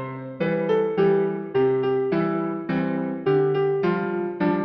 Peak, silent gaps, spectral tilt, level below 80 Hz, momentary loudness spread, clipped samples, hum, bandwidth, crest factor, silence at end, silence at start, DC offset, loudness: -10 dBFS; none; -10 dB/octave; -62 dBFS; 6 LU; under 0.1%; none; 5.6 kHz; 14 dB; 0 s; 0 s; under 0.1%; -23 LUFS